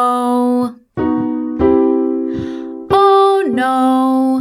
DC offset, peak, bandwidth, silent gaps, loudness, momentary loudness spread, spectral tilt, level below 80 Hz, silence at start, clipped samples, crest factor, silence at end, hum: under 0.1%; 0 dBFS; 14.5 kHz; none; -14 LUFS; 11 LU; -6.5 dB/octave; -42 dBFS; 0 s; under 0.1%; 14 dB; 0 s; none